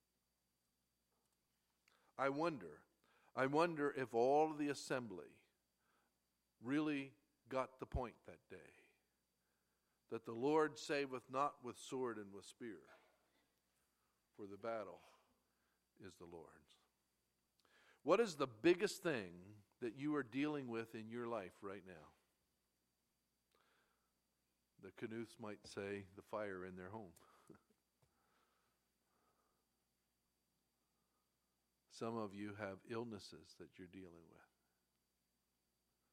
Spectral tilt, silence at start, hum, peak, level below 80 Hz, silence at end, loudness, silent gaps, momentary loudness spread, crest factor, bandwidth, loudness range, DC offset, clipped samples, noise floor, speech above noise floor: -5.5 dB/octave; 2.2 s; 60 Hz at -85 dBFS; -22 dBFS; -72 dBFS; 1.8 s; -44 LUFS; none; 22 LU; 26 dB; 15.5 kHz; 15 LU; under 0.1%; under 0.1%; -87 dBFS; 43 dB